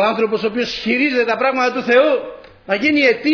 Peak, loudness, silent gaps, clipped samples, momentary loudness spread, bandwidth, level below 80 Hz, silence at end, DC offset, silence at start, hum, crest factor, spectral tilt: -2 dBFS; -16 LUFS; none; under 0.1%; 7 LU; 5.4 kHz; -54 dBFS; 0 s; under 0.1%; 0 s; none; 16 dB; -4.5 dB/octave